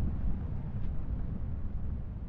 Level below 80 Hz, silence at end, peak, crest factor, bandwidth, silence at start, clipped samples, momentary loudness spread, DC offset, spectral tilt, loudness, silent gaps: -36 dBFS; 0 s; -20 dBFS; 12 dB; 3.1 kHz; 0 s; under 0.1%; 3 LU; under 0.1%; -10.5 dB/octave; -38 LUFS; none